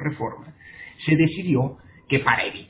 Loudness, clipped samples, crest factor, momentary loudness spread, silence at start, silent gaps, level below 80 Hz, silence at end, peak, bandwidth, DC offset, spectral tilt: -23 LUFS; under 0.1%; 20 dB; 21 LU; 0 s; none; -54 dBFS; 0.05 s; -4 dBFS; 4 kHz; under 0.1%; -10.5 dB/octave